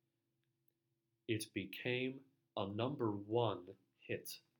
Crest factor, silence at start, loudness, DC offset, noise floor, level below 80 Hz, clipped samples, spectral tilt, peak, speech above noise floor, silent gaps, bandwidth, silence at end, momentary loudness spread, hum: 22 dB; 1.3 s; -42 LUFS; under 0.1%; -87 dBFS; -86 dBFS; under 0.1%; -5.5 dB/octave; -22 dBFS; 45 dB; none; 19 kHz; 0.2 s; 16 LU; none